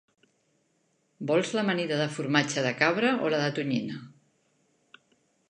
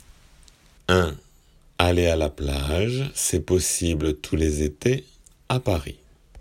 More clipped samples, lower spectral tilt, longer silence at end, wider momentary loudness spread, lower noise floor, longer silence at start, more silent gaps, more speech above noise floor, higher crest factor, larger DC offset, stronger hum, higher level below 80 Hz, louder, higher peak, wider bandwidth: neither; about the same, -5 dB/octave vs -4.5 dB/octave; first, 1.4 s vs 0 s; about the same, 7 LU vs 7 LU; first, -72 dBFS vs -55 dBFS; first, 1.2 s vs 0.9 s; neither; first, 45 dB vs 32 dB; about the same, 20 dB vs 22 dB; neither; neither; second, -78 dBFS vs -38 dBFS; second, -27 LUFS vs -24 LUFS; second, -8 dBFS vs -2 dBFS; second, 10.5 kHz vs 16 kHz